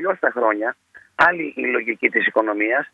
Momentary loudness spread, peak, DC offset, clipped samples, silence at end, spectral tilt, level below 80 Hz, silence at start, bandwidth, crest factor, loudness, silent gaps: 9 LU; -2 dBFS; under 0.1%; under 0.1%; 0.05 s; -5.5 dB/octave; -64 dBFS; 0 s; 7.8 kHz; 18 dB; -19 LUFS; none